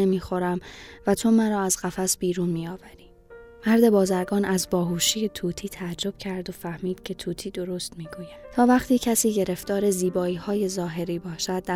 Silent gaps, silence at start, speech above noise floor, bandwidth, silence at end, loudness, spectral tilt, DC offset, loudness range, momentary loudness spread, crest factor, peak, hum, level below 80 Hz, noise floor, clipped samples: none; 0 s; 23 dB; 16 kHz; 0 s; -25 LUFS; -4.5 dB/octave; under 0.1%; 5 LU; 12 LU; 18 dB; -6 dBFS; none; -52 dBFS; -47 dBFS; under 0.1%